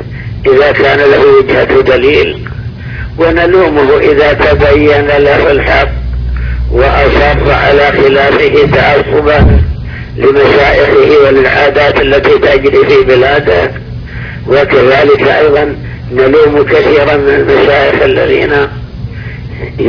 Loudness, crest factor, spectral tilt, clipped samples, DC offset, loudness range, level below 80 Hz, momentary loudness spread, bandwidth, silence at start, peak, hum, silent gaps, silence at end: -7 LUFS; 6 dB; -7.5 dB/octave; 4%; under 0.1%; 2 LU; -20 dBFS; 15 LU; 5.4 kHz; 0 s; 0 dBFS; none; none; 0 s